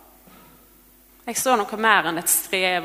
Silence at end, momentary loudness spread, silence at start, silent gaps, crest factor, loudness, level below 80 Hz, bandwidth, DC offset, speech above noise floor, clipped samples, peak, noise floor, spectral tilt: 0 s; 8 LU; 1.25 s; none; 20 dB; -20 LUFS; -60 dBFS; 16 kHz; under 0.1%; 32 dB; under 0.1%; -2 dBFS; -53 dBFS; -1.5 dB/octave